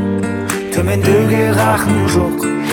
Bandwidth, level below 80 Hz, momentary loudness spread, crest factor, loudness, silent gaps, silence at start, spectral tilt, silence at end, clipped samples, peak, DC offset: 18.5 kHz; -38 dBFS; 6 LU; 14 dB; -14 LUFS; none; 0 s; -6 dB/octave; 0 s; under 0.1%; 0 dBFS; under 0.1%